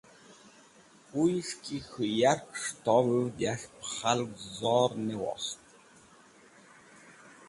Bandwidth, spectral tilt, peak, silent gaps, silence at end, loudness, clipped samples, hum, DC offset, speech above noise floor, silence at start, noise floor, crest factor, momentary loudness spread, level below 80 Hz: 11.5 kHz; -4.5 dB/octave; -12 dBFS; none; 0.05 s; -30 LUFS; under 0.1%; none; under 0.1%; 28 dB; 0.3 s; -58 dBFS; 20 dB; 12 LU; -68 dBFS